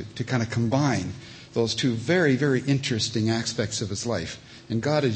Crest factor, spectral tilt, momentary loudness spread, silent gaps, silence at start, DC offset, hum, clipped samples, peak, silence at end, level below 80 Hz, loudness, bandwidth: 16 dB; -5 dB/octave; 10 LU; none; 0 s; under 0.1%; none; under 0.1%; -8 dBFS; 0 s; -56 dBFS; -25 LUFS; 8.8 kHz